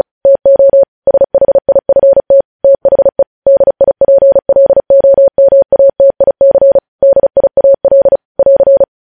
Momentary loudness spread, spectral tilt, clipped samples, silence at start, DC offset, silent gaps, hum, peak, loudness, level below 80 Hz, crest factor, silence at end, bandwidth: 3 LU; -11 dB/octave; under 0.1%; 0.25 s; 0.3%; 0.88-1.02 s, 2.45-2.59 s, 3.27-3.42 s, 6.88-6.99 s, 8.25-8.35 s; none; 0 dBFS; -8 LUFS; -42 dBFS; 6 dB; 0.2 s; 1.8 kHz